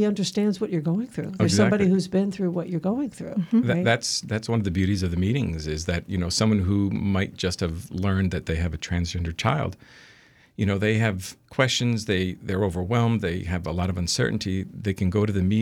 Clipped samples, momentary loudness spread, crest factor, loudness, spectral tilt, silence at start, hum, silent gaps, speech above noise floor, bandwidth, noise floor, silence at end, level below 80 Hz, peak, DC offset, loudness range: under 0.1%; 7 LU; 18 dB; -25 LUFS; -5.5 dB/octave; 0 s; none; none; 31 dB; 13.5 kHz; -55 dBFS; 0 s; -48 dBFS; -6 dBFS; under 0.1%; 3 LU